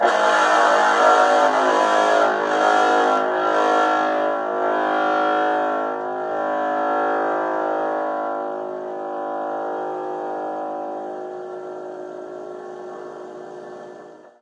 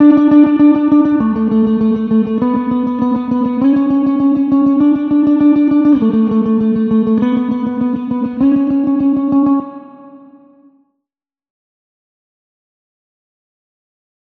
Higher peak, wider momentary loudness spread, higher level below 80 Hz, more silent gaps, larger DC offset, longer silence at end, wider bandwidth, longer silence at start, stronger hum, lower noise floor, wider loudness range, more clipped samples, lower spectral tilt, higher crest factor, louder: second, -4 dBFS vs 0 dBFS; first, 19 LU vs 7 LU; second, -78 dBFS vs -50 dBFS; neither; neither; second, 0.15 s vs 4.2 s; first, 11 kHz vs 4.1 kHz; about the same, 0 s vs 0 s; neither; second, -42 dBFS vs -83 dBFS; first, 14 LU vs 6 LU; neither; second, -3 dB/octave vs -10 dB/octave; about the same, 18 dB vs 14 dB; second, -20 LUFS vs -12 LUFS